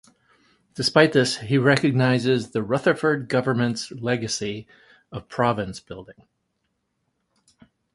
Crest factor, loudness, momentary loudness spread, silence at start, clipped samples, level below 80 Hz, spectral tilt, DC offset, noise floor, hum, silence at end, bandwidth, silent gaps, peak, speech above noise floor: 22 dB; -22 LUFS; 19 LU; 0.75 s; under 0.1%; -58 dBFS; -5.5 dB/octave; under 0.1%; -75 dBFS; none; 1.85 s; 11.5 kHz; none; -2 dBFS; 53 dB